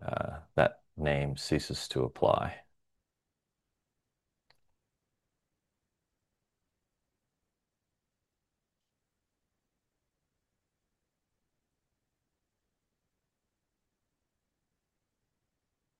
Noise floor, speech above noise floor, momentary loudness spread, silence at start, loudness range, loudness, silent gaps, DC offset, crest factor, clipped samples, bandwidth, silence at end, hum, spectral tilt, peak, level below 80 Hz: -87 dBFS; 56 dB; 8 LU; 0 s; 5 LU; -32 LUFS; none; under 0.1%; 30 dB; under 0.1%; 12 kHz; 13.4 s; none; -5.5 dB/octave; -8 dBFS; -58 dBFS